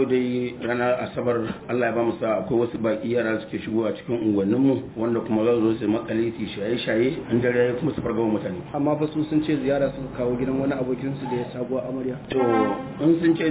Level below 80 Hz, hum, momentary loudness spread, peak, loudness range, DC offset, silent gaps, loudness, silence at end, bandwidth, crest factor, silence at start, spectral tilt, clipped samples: -52 dBFS; none; 7 LU; -8 dBFS; 2 LU; under 0.1%; none; -24 LUFS; 0 s; 4 kHz; 16 dB; 0 s; -11.5 dB/octave; under 0.1%